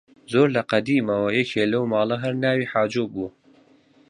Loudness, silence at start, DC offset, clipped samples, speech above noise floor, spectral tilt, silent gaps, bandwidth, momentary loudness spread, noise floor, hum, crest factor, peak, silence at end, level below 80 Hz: -22 LUFS; 0.3 s; under 0.1%; under 0.1%; 34 dB; -6.5 dB/octave; none; 10.5 kHz; 7 LU; -56 dBFS; none; 18 dB; -4 dBFS; 0.8 s; -62 dBFS